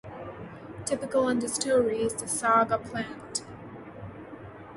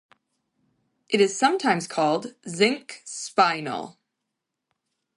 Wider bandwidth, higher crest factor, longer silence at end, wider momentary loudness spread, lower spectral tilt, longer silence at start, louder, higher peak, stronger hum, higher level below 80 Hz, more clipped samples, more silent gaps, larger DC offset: about the same, 11.5 kHz vs 11.5 kHz; about the same, 20 dB vs 22 dB; second, 0 s vs 1.25 s; first, 20 LU vs 14 LU; about the same, -3.5 dB/octave vs -3.5 dB/octave; second, 0.05 s vs 1.1 s; second, -27 LUFS vs -23 LUFS; second, -10 dBFS vs -4 dBFS; neither; first, -58 dBFS vs -76 dBFS; neither; neither; neither